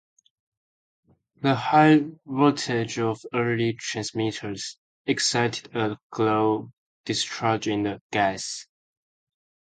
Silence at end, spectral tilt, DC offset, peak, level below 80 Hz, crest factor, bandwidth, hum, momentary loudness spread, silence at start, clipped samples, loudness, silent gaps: 1 s; -4.5 dB/octave; under 0.1%; -4 dBFS; -64 dBFS; 20 dB; 9.4 kHz; none; 12 LU; 1.4 s; under 0.1%; -24 LUFS; 4.78-5.05 s, 6.03-6.10 s, 6.78-7.04 s, 8.01-8.10 s